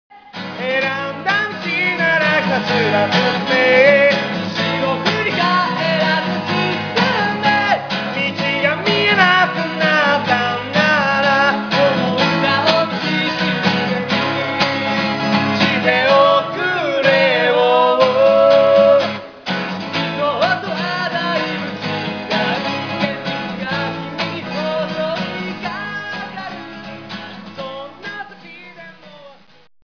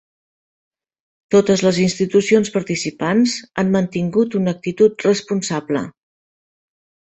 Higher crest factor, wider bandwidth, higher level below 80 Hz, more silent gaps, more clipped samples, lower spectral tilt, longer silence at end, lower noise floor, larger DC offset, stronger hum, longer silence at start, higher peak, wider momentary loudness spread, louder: about the same, 16 dB vs 16 dB; second, 5.4 kHz vs 8.2 kHz; about the same, -58 dBFS vs -56 dBFS; neither; neither; about the same, -5.5 dB/octave vs -5.5 dB/octave; second, 0.65 s vs 1.3 s; second, -44 dBFS vs under -90 dBFS; neither; neither; second, 0.15 s vs 1.3 s; about the same, 0 dBFS vs -2 dBFS; first, 15 LU vs 7 LU; about the same, -16 LUFS vs -18 LUFS